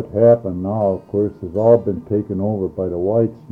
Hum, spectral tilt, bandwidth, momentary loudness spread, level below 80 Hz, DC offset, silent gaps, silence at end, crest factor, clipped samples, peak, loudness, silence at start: none; -12 dB/octave; 2.9 kHz; 8 LU; -50 dBFS; under 0.1%; none; 0 s; 16 dB; under 0.1%; -2 dBFS; -18 LUFS; 0 s